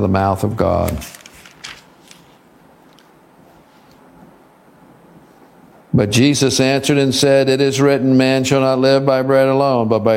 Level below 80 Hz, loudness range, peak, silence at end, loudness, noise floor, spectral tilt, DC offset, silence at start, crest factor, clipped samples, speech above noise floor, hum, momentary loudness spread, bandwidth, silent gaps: -44 dBFS; 12 LU; 0 dBFS; 0 s; -14 LUFS; -48 dBFS; -5 dB/octave; under 0.1%; 0 s; 16 dB; under 0.1%; 34 dB; none; 12 LU; 16.5 kHz; none